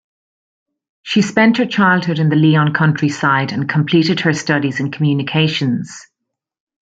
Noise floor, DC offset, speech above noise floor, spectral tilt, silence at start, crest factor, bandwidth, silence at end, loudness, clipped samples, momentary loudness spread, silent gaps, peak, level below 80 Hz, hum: -79 dBFS; under 0.1%; 64 dB; -6 dB/octave; 1.05 s; 16 dB; 7.8 kHz; 0.9 s; -15 LUFS; under 0.1%; 6 LU; none; 0 dBFS; -58 dBFS; none